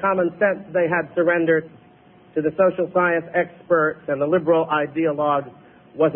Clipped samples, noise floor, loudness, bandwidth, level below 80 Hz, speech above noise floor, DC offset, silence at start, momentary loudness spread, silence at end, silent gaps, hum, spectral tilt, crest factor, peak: under 0.1%; -50 dBFS; -21 LUFS; 3.6 kHz; -62 dBFS; 30 dB; under 0.1%; 0 s; 6 LU; 0 s; none; none; -11.5 dB/octave; 14 dB; -6 dBFS